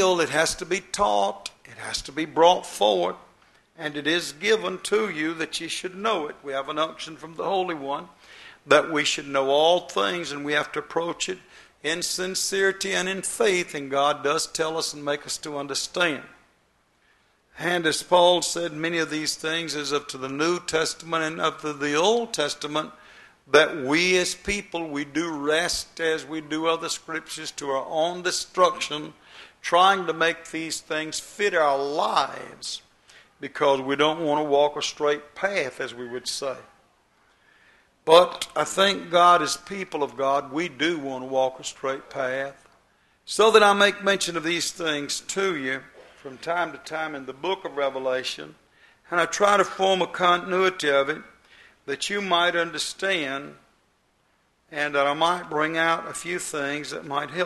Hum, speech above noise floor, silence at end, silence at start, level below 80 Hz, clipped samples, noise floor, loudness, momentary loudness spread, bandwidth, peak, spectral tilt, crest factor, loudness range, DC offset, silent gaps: none; 42 dB; 0 s; 0 s; -60 dBFS; under 0.1%; -66 dBFS; -24 LUFS; 12 LU; 12.5 kHz; 0 dBFS; -2.5 dB/octave; 24 dB; 5 LU; under 0.1%; none